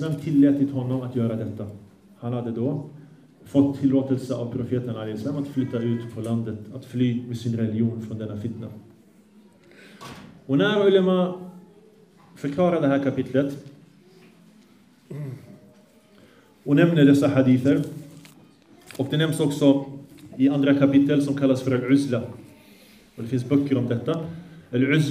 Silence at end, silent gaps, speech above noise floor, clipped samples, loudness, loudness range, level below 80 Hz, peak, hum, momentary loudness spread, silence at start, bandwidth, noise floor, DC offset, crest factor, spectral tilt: 0 s; none; 33 dB; under 0.1%; -23 LUFS; 7 LU; -66 dBFS; -4 dBFS; none; 20 LU; 0 s; 13 kHz; -55 dBFS; under 0.1%; 20 dB; -7.5 dB/octave